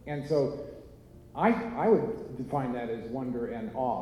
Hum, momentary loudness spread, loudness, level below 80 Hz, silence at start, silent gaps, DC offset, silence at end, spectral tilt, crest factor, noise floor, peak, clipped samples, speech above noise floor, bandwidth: none; 14 LU; -30 LUFS; -56 dBFS; 0.05 s; none; under 0.1%; 0 s; -8.5 dB/octave; 18 dB; -51 dBFS; -12 dBFS; under 0.1%; 21 dB; 12 kHz